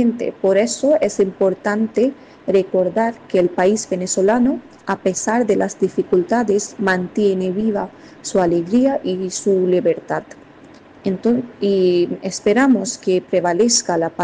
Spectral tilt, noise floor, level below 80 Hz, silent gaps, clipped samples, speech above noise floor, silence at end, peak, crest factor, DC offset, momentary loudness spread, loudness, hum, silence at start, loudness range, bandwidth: -4.5 dB/octave; -43 dBFS; -56 dBFS; none; under 0.1%; 26 dB; 0 s; -6 dBFS; 12 dB; under 0.1%; 6 LU; -18 LUFS; none; 0 s; 2 LU; 10 kHz